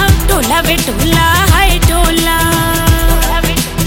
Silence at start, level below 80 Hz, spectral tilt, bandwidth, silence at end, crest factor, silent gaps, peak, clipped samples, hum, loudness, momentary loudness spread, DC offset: 0 s; -14 dBFS; -4 dB/octave; 17.5 kHz; 0 s; 10 dB; none; 0 dBFS; under 0.1%; none; -10 LUFS; 4 LU; under 0.1%